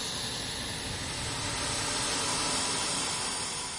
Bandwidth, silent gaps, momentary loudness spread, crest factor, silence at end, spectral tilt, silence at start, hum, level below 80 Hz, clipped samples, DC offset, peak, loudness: 11.5 kHz; none; 6 LU; 14 dB; 0 s; -1.5 dB/octave; 0 s; none; -50 dBFS; under 0.1%; under 0.1%; -18 dBFS; -30 LUFS